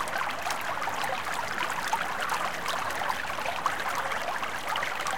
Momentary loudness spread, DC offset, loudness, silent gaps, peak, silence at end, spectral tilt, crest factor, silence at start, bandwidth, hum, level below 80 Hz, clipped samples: 2 LU; 1%; -30 LUFS; none; -14 dBFS; 0 s; -1.5 dB/octave; 18 dB; 0 s; 17 kHz; none; -60 dBFS; under 0.1%